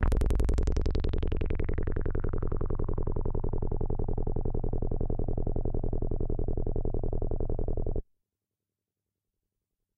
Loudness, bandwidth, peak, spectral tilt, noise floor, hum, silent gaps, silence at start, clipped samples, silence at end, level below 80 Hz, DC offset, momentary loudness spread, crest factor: -34 LUFS; 4.4 kHz; -12 dBFS; -8.5 dB/octave; -89 dBFS; none; none; 0 s; under 0.1%; 1.95 s; -30 dBFS; under 0.1%; 5 LU; 16 dB